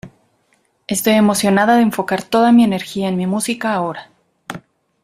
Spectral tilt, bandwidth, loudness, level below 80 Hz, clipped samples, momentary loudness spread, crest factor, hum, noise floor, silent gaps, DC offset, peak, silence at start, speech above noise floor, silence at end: -5 dB/octave; 16 kHz; -15 LUFS; -56 dBFS; under 0.1%; 20 LU; 14 dB; none; -61 dBFS; none; under 0.1%; -2 dBFS; 0.05 s; 47 dB; 0.45 s